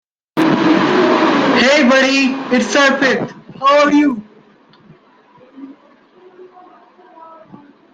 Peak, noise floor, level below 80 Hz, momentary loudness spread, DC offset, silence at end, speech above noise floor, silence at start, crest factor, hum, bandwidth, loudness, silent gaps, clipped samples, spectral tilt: 0 dBFS; -48 dBFS; -58 dBFS; 8 LU; under 0.1%; 2.2 s; 35 dB; 0.35 s; 16 dB; none; 9.4 kHz; -12 LUFS; none; under 0.1%; -4 dB/octave